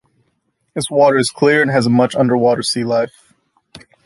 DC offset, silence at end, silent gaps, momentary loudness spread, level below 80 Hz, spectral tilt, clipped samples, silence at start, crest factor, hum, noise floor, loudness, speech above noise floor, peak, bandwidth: under 0.1%; 0.25 s; none; 9 LU; -58 dBFS; -5 dB/octave; under 0.1%; 0.75 s; 14 dB; none; -66 dBFS; -15 LUFS; 52 dB; -2 dBFS; 11.5 kHz